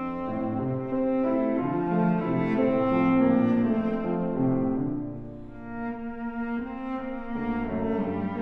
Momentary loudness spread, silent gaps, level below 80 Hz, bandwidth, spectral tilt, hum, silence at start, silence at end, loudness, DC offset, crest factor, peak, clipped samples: 11 LU; none; -48 dBFS; 4.7 kHz; -10.5 dB/octave; none; 0 s; 0 s; -27 LUFS; under 0.1%; 14 dB; -12 dBFS; under 0.1%